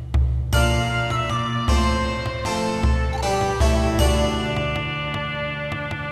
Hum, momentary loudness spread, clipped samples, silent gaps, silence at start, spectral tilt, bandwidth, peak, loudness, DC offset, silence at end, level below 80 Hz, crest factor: none; 6 LU; under 0.1%; none; 0 s; -5 dB/octave; 13.5 kHz; -4 dBFS; -22 LUFS; 0.1%; 0 s; -26 dBFS; 18 dB